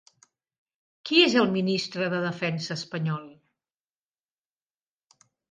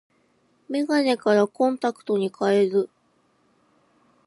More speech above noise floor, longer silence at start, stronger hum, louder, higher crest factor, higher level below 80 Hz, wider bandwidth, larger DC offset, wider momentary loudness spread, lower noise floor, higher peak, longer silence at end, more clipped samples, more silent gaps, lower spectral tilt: first, over 65 dB vs 43 dB; first, 1.05 s vs 0.7 s; neither; about the same, -25 LUFS vs -23 LUFS; first, 24 dB vs 18 dB; first, -72 dBFS vs -78 dBFS; second, 9.6 kHz vs 11.5 kHz; neither; first, 12 LU vs 8 LU; first, under -90 dBFS vs -65 dBFS; about the same, -6 dBFS vs -8 dBFS; first, 2.2 s vs 1.4 s; neither; neither; about the same, -5 dB/octave vs -6 dB/octave